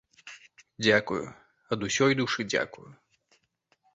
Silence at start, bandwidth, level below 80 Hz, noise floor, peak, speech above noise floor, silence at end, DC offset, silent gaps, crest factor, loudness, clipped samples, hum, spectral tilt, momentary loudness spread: 0.25 s; 8.2 kHz; -64 dBFS; -72 dBFS; -8 dBFS; 44 dB; 1 s; under 0.1%; none; 22 dB; -27 LUFS; under 0.1%; none; -4 dB/octave; 22 LU